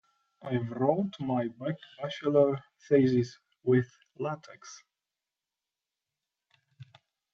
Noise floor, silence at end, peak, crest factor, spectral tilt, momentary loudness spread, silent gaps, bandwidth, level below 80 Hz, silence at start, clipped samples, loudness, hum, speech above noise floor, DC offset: under -90 dBFS; 0.5 s; -12 dBFS; 20 dB; -7.5 dB/octave; 17 LU; none; 7.4 kHz; -76 dBFS; 0.45 s; under 0.1%; -30 LUFS; none; over 61 dB; under 0.1%